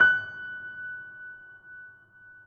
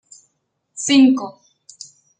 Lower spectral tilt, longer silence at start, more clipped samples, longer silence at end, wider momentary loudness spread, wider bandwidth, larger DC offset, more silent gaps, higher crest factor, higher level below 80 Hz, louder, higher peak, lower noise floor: about the same, -3.5 dB/octave vs -2.5 dB/octave; second, 0 s vs 0.75 s; neither; second, 0.05 s vs 0.9 s; second, 21 LU vs 26 LU; second, 6.6 kHz vs 9.4 kHz; neither; neither; first, 22 dB vs 16 dB; about the same, -72 dBFS vs -70 dBFS; second, -30 LUFS vs -15 LUFS; second, -8 dBFS vs -4 dBFS; second, -53 dBFS vs -70 dBFS